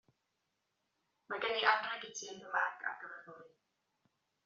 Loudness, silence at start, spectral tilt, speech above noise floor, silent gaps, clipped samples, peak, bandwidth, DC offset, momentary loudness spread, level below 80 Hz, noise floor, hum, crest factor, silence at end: -36 LUFS; 1.3 s; 2 dB/octave; 47 dB; none; under 0.1%; -14 dBFS; 7.4 kHz; under 0.1%; 18 LU; -90 dBFS; -84 dBFS; none; 28 dB; 1 s